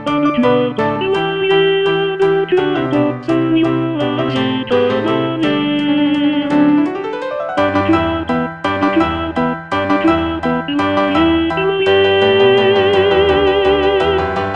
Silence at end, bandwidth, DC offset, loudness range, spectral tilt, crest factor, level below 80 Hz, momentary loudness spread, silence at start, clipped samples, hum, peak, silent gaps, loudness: 0 s; 8.6 kHz; 0.2%; 4 LU; -7 dB/octave; 14 dB; -40 dBFS; 6 LU; 0 s; under 0.1%; none; 0 dBFS; none; -14 LUFS